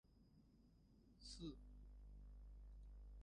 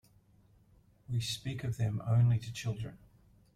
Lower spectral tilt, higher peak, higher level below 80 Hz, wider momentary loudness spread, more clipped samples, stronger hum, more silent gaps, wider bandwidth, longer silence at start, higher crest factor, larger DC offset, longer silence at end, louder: about the same, -5.5 dB/octave vs -6 dB/octave; second, -42 dBFS vs -20 dBFS; about the same, -62 dBFS vs -60 dBFS; about the same, 9 LU vs 11 LU; neither; neither; neither; second, 10 kHz vs 13.5 kHz; second, 0.05 s vs 1.1 s; about the same, 18 dB vs 16 dB; neither; second, 0 s vs 0.6 s; second, -61 LUFS vs -34 LUFS